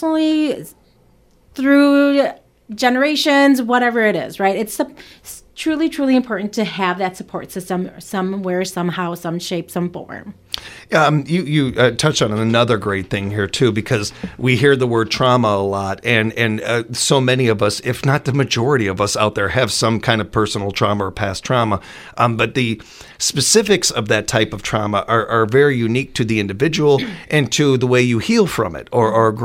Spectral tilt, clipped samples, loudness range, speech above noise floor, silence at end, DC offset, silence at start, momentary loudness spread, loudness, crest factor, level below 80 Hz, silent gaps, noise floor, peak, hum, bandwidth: -4.5 dB/octave; under 0.1%; 5 LU; 36 dB; 0 s; under 0.1%; 0 s; 10 LU; -17 LUFS; 16 dB; -48 dBFS; none; -53 dBFS; 0 dBFS; none; 16.5 kHz